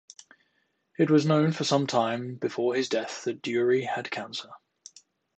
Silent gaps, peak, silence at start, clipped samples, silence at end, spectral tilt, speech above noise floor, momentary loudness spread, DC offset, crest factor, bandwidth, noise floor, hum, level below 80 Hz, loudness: none; -10 dBFS; 1 s; under 0.1%; 0.8 s; -5.5 dB/octave; 47 dB; 12 LU; under 0.1%; 18 dB; 9 kHz; -73 dBFS; none; -76 dBFS; -27 LUFS